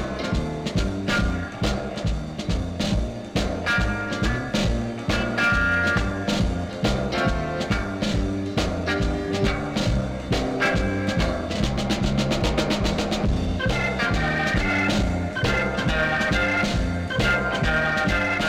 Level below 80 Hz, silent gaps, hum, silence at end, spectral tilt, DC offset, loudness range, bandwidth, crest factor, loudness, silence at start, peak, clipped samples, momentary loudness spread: -30 dBFS; none; none; 0 s; -5.5 dB/octave; under 0.1%; 3 LU; 14.5 kHz; 14 dB; -24 LUFS; 0 s; -8 dBFS; under 0.1%; 5 LU